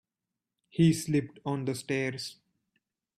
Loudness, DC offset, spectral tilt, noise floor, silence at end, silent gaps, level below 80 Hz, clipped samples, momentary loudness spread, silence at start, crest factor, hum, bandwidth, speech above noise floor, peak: -30 LUFS; under 0.1%; -6 dB/octave; -89 dBFS; 0.85 s; none; -66 dBFS; under 0.1%; 14 LU; 0.75 s; 18 dB; none; 14 kHz; 60 dB; -14 dBFS